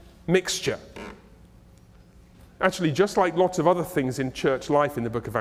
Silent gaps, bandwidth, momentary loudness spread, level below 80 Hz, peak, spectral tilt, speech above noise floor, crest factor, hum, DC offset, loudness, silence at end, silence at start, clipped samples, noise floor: none; 16 kHz; 9 LU; -52 dBFS; -4 dBFS; -5 dB/octave; 28 dB; 22 dB; none; under 0.1%; -24 LUFS; 0 s; 0.25 s; under 0.1%; -52 dBFS